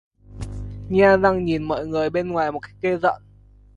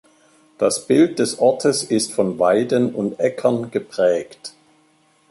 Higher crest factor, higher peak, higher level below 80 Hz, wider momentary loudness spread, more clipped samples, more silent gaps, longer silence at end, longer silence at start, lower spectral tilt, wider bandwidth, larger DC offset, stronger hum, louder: about the same, 18 dB vs 16 dB; about the same, -2 dBFS vs -4 dBFS; first, -42 dBFS vs -64 dBFS; first, 19 LU vs 8 LU; neither; neither; second, 0.6 s vs 0.8 s; second, 0.3 s vs 0.6 s; first, -7.5 dB/octave vs -4.5 dB/octave; second, 10.5 kHz vs 12 kHz; neither; first, 50 Hz at -40 dBFS vs none; about the same, -21 LUFS vs -19 LUFS